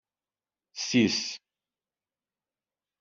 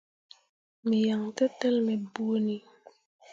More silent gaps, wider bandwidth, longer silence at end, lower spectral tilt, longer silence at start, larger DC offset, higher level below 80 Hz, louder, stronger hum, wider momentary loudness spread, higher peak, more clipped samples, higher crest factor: second, none vs 3.06-3.19 s; about the same, 7.8 kHz vs 7.8 kHz; first, 1.65 s vs 0 s; second, -3.5 dB/octave vs -6.5 dB/octave; about the same, 0.75 s vs 0.85 s; neither; first, -72 dBFS vs -78 dBFS; about the same, -27 LUFS vs -29 LUFS; neither; first, 19 LU vs 6 LU; about the same, -12 dBFS vs -12 dBFS; neither; about the same, 22 dB vs 18 dB